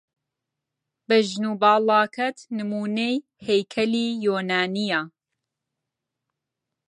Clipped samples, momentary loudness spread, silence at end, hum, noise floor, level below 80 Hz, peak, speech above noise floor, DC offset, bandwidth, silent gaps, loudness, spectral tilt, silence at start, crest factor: under 0.1%; 9 LU; 1.8 s; none; -84 dBFS; -72 dBFS; -6 dBFS; 62 dB; under 0.1%; 11 kHz; none; -23 LUFS; -5 dB/octave; 1.1 s; 20 dB